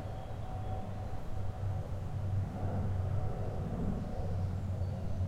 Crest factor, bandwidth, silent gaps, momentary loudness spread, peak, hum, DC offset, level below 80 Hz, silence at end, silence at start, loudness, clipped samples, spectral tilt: 14 dB; 8.4 kHz; none; 6 LU; -22 dBFS; none; under 0.1%; -44 dBFS; 0 s; 0 s; -38 LUFS; under 0.1%; -8.5 dB/octave